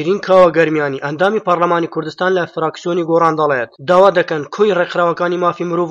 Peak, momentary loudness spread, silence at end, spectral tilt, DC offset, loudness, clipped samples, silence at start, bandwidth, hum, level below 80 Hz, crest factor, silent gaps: 0 dBFS; 9 LU; 0 s; -6.5 dB/octave; under 0.1%; -14 LUFS; under 0.1%; 0 s; 7.8 kHz; none; -58 dBFS; 14 dB; none